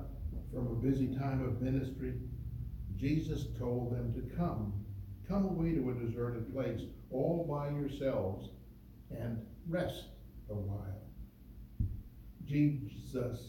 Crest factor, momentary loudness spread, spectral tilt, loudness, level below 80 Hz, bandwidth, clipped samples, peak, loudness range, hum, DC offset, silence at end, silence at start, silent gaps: 16 dB; 16 LU; -9 dB/octave; -38 LUFS; -48 dBFS; 17 kHz; under 0.1%; -20 dBFS; 6 LU; none; under 0.1%; 0 s; 0 s; none